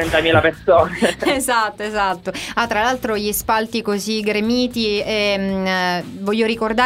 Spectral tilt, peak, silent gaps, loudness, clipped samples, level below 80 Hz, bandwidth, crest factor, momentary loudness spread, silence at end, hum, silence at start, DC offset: -4 dB/octave; 0 dBFS; none; -18 LUFS; under 0.1%; -42 dBFS; 16 kHz; 18 dB; 7 LU; 0 s; none; 0 s; under 0.1%